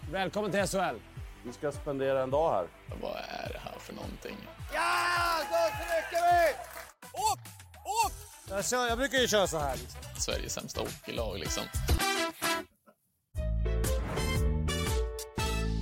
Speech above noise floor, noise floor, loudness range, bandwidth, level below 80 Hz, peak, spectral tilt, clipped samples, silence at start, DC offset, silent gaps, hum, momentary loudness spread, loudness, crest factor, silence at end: 35 dB; -66 dBFS; 4 LU; 16.5 kHz; -40 dBFS; -14 dBFS; -4 dB/octave; under 0.1%; 0 s; under 0.1%; none; none; 16 LU; -31 LUFS; 18 dB; 0 s